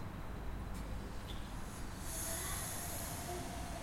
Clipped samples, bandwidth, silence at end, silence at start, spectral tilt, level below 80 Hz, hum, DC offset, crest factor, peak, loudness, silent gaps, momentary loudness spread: under 0.1%; 16.5 kHz; 0 s; 0 s; -3.5 dB/octave; -48 dBFS; none; under 0.1%; 14 dB; -28 dBFS; -43 LUFS; none; 8 LU